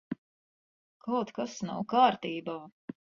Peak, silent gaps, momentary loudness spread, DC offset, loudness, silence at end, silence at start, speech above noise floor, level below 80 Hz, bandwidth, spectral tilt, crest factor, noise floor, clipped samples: -10 dBFS; 0.18-1.00 s; 18 LU; under 0.1%; -30 LUFS; 0.35 s; 0.1 s; over 60 dB; -74 dBFS; 7.4 kHz; -5 dB/octave; 22 dB; under -90 dBFS; under 0.1%